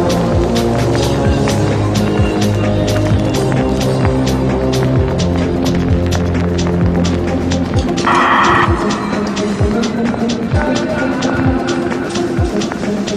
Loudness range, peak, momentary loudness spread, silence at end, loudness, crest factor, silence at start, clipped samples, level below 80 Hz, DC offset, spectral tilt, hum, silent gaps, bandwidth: 2 LU; 0 dBFS; 4 LU; 0 s; -14 LUFS; 14 dB; 0 s; under 0.1%; -26 dBFS; under 0.1%; -6 dB/octave; none; none; 15 kHz